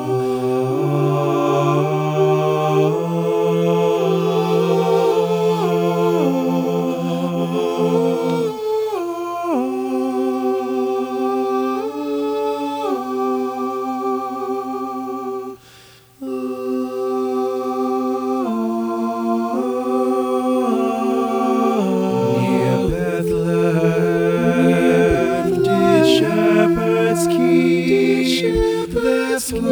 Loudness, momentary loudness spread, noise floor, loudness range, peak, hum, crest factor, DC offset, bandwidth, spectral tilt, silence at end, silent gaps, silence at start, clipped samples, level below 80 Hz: -18 LUFS; 8 LU; -46 dBFS; 8 LU; -2 dBFS; none; 16 dB; under 0.1%; over 20 kHz; -6.5 dB/octave; 0 s; none; 0 s; under 0.1%; -42 dBFS